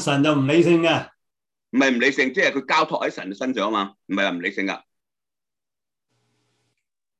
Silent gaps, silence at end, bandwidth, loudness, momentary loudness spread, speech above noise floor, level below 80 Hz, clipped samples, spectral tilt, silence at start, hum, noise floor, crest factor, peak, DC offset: none; 2.4 s; 11.5 kHz; -21 LUFS; 10 LU; over 69 dB; -68 dBFS; under 0.1%; -5 dB/octave; 0 s; none; under -90 dBFS; 18 dB; -6 dBFS; under 0.1%